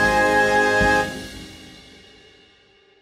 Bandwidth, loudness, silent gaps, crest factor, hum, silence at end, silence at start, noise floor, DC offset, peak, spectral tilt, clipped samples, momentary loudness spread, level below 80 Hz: 16 kHz; -17 LUFS; none; 16 dB; none; 1.35 s; 0 s; -55 dBFS; under 0.1%; -6 dBFS; -4 dB/octave; under 0.1%; 21 LU; -40 dBFS